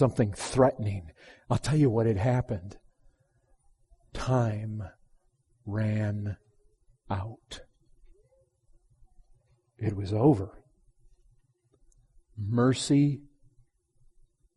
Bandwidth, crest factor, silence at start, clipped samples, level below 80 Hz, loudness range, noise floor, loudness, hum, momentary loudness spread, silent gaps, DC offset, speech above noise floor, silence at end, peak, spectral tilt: 11.5 kHz; 22 dB; 0 s; under 0.1%; -54 dBFS; 10 LU; -68 dBFS; -28 LUFS; none; 21 LU; none; under 0.1%; 41 dB; 1.35 s; -8 dBFS; -7 dB/octave